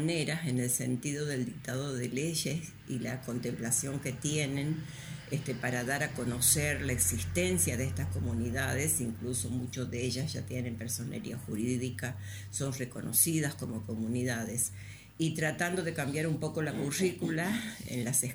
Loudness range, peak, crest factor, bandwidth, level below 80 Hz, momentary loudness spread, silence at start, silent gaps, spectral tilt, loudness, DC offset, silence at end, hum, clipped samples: 5 LU; -12 dBFS; 22 dB; over 20 kHz; -56 dBFS; 10 LU; 0 s; none; -4 dB/octave; -33 LUFS; under 0.1%; 0 s; none; under 0.1%